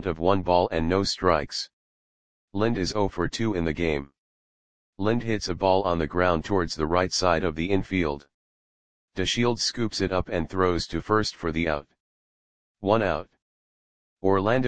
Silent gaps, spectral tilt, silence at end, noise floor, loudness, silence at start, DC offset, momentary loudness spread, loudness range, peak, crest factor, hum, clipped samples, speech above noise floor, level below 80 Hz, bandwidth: 1.73-2.48 s, 4.18-4.93 s, 8.34-9.08 s, 12.00-12.75 s, 13.42-14.17 s; -5 dB/octave; 0 s; under -90 dBFS; -25 LUFS; 0 s; 0.9%; 7 LU; 4 LU; -4 dBFS; 22 dB; none; under 0.1%; over 65 dB; -44 dBFS; 10 kHz